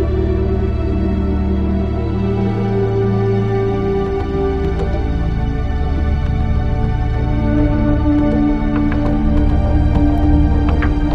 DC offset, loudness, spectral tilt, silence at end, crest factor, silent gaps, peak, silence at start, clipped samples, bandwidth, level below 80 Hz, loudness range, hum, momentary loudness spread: under 0.1%; -17 LUFS; -9.5 dB/octave; 0 s; 14 dB; none; 0 dBFS; 0 s; under 0.1%; 6.2 kHz; -18 dBFS; 3 LU; none; 4 LU